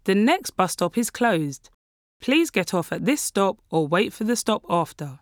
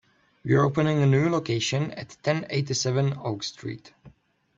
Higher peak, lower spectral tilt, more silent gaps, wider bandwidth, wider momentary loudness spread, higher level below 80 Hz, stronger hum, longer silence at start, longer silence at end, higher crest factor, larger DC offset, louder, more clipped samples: about the same, -6 dBFS vs -8 dBFS; about the same, -4.5 dB/octave vs -5.5 dB/octave; first, 1.74-2.20 s vs none; first, over 20 kHz vs 7.8 kHz; second, 6 LU vs 14 LU; about the same, -62 dBFS vs -60 dBFS; neither; second, 0.05 s vs 0.45 s; second, 0.05 s vs 0.5 s; about the same, 18 dB vs 18 dB; neither; about the same, -23 LUFS vs -25 LUFS; neither